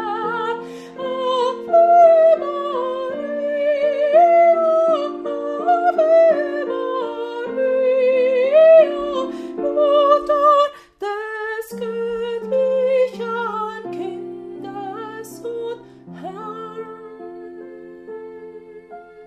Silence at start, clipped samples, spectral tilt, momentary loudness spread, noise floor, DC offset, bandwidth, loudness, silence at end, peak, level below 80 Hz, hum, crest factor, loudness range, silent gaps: 0 s; under 0.1%; -5 dB/octave; 22 LU; -39 dBFS; under 0.1%; 13 kHz; -17 LUFS; 0 s; -2 dBFS; -62 dBFS; none; 16 dB; 16 LU; none